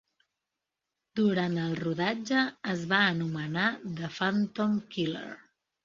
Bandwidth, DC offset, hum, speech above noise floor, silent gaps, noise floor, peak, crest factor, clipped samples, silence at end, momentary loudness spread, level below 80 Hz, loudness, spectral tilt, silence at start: 7.6 kHz; under 0.1%; none; 58 dB; none; -87 dBFS; -10 dBFS; 22 dB; under 0.1%; 0.45 s; 11 LU; -70 dBFS; -29 LUFS; -6 dB/octave; 1.15 s